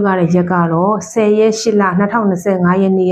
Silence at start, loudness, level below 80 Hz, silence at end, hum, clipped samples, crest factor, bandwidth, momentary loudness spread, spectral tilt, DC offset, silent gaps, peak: 0 s; -13 LUFS; -54 dBFS; 0 s; none; under 0.1%; 10 dB; 9.6 kHz; 3 LU; -6.5 dB/octave; under 0.1%; none; -2 dBFS